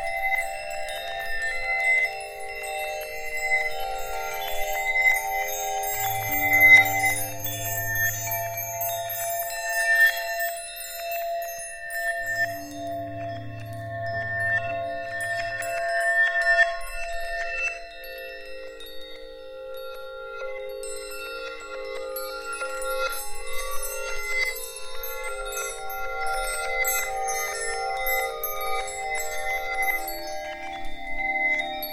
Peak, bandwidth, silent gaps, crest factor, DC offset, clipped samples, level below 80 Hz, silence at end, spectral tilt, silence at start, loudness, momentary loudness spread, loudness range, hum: -4 dBFS; 17 kHz; none; 22 dB; 0.2%; under 0.1%; -44 dBFS; 0 s; -1.5 dB/octave; 0 s; -25 LUFS; 15 LU; 13 LU; none